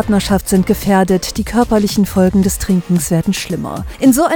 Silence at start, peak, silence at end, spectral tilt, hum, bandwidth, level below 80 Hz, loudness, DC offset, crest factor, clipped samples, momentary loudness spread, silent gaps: 0 s; 0 dBFS; 0 s; -5.5 dB/octave; none; 19.5 kHz; -30 dBFS; -14 LUFS; under 0.1%; 14 dB; under 0.1%; 6 LU; none